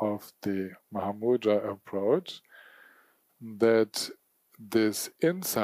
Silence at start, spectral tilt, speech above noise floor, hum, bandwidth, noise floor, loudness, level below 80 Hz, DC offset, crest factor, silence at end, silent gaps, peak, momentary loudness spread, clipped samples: 0 s; -4.5 dB/octave; 35 dB; none; 15.5 kHz; -64 dBFS; -29 LUFS; -76 dBFS; under 0.1%; 18 dB; 0 s; none; -12 dBFS; 12 LU; under 0.1%